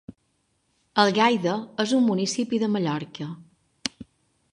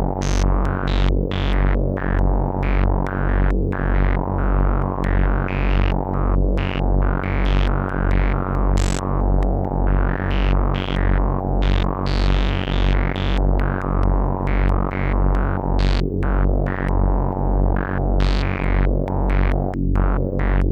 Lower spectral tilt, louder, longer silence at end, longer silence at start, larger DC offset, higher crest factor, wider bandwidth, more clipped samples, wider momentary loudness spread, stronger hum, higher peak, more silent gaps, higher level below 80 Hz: second, -4.5 dB/octave vs -7 dB/octave; second, -24 LUFS vs -21 LUFS; first, 0.5 s vs 0 s; about the same, 0.1 s vs 0 s; neither; first, 22 dB vs 12 dB; first, 11 kHz vs 8.2 kHz; neither; first, 15 LU vs 2 LU; neither; about the same, -4 dBFS vs -6 dBFS; neither; second, -68 dBFS vs -20 dBFS